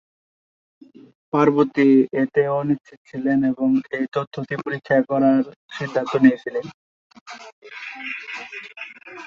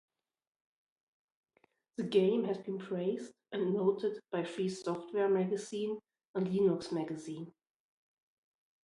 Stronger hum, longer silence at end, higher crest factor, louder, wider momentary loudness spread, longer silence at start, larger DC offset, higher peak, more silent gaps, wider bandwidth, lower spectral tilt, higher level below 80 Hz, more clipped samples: neither; second, 0 s vs 1.35 s; about the same, 18 dB vs 20 dB; first, -21 LUFS vs -35 LUFS; first, 19 LU vs 12 LU; second, 1.35 s vs 2 s; neither; first, -2 dBFS vs -16 dBFS; first, 2.97-3.05 s, 4.27-4.31 s, 5.56-5.69 s, 6.74-7.10 s, 7.21-7.26 s, 7.53-7.62 s vs 6.27-6.34 s; second, 7 kHz vs 11.5 kHz; about the same, -7.5 dB/octave vs -6.5 dB/octave; first, -64 dBFS vs -80 dBFS; neither